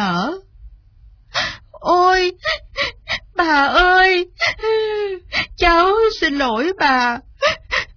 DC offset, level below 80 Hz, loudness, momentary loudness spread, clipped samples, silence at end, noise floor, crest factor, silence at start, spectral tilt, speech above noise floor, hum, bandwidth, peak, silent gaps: under 0.1%; -38 dBFS; -17 LUFS; 10 LU; under 0.1%; 0.1 s; -47 dBFS; 16 dB; 0 s; -4 dB/octave; 31 dB; none; 5.4 kHz; -2 dBFS; none